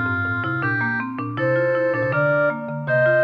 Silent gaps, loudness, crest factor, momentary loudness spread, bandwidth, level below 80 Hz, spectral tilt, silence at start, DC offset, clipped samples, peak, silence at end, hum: none; -21 LUFS; 12 dB; 5 LU; 5.8 kHz; -58 dBFS; -9 dB/octave; 0 s; under 0.1%; under 0.1%; -8 dBFS; 0 s; none